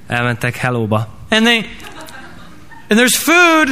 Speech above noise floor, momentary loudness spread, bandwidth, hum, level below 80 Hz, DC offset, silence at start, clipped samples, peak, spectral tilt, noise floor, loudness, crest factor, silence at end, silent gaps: 26 dB; 23 LU; 15.5 kHz; none; -46 dBFS; 1%; 0.1 s; under 0.1%; 0 dBFS; -3.5 dB/octave; -39 dBFS; -13 LUFS; 14 dB; 0 s; none